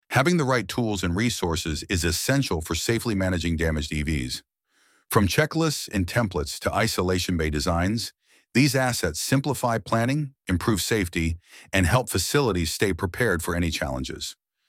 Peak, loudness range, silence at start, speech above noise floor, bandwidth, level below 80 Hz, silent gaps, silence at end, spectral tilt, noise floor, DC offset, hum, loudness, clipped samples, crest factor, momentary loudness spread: -6 dBFS; 2 LU; 0.1 s; 41 dB; 17 kHz; -40 dBFS; none; 0.35 s; -4.5 dB/octave; -65 dBFS; under 0.1%; none; -25 LUFS; under 0.1%; 20 dB; 7 LU